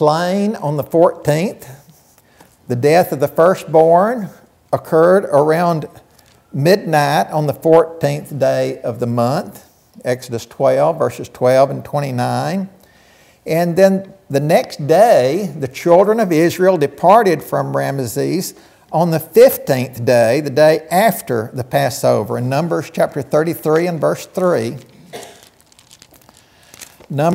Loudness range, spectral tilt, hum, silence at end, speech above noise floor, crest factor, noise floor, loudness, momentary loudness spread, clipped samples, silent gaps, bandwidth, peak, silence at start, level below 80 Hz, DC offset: 5 LU; -6 dB/octave; none; 0 s; 35 dB; 16 dB; -50 dBFS; -15 LUFS; 12 LU; under 0.1%; none; 16.5 kHz; 0 dBFS; 0 s; -58 dBFS; under 0.1%